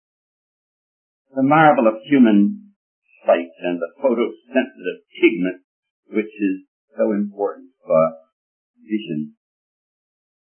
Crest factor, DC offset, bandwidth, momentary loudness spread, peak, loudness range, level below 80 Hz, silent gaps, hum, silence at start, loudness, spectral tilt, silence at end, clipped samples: 20 dB; under 0.1%; 3.4 kHz; 16 LU; 0 dBFS; 6 LU; -74 dBFS; 2.76-3.02 s, 5.64-5.83 s, 5.90-6.03 s, 6.68-6.88 s, 8.32-8.74 s; none; 1.35 s; -19 LUFS; -11.5 dB/octave; 1.2 s; under 0.1%